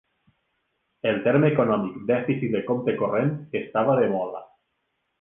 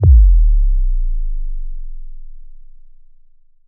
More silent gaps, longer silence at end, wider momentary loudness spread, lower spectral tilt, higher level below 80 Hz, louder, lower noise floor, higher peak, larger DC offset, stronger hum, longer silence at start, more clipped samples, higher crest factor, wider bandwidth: neither; second, 0.75 s vs 1.1 s; second, 9 LU vs 25 LU; second, -10.5 dB/octave vs -15 dB/octave; second, -64 dBFS vs -14 dBFS; second, -24 LUFS vs -17 LUFS; first, -76 dBFS vs -45 dBFS; second, -8 dBFS vs -2 dBFS; neither; neither; first, 1.05 s vs 0 s; neither; first, 18 dB vs 12 dB; first, 3.8 kHz vs 1 kHz